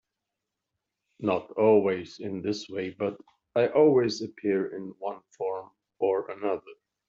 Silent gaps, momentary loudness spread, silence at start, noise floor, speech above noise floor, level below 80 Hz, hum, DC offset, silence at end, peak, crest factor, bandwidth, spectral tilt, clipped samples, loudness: none; 14 LU; 1.2 s; -86 dBFS; 59 dB; -72 dBFS; none; under 0.1%; 0.35 s; -10 dBFS; 18 dB; 7.6 kHz; -5 dB/octave; under 0.1%; -28 LUFS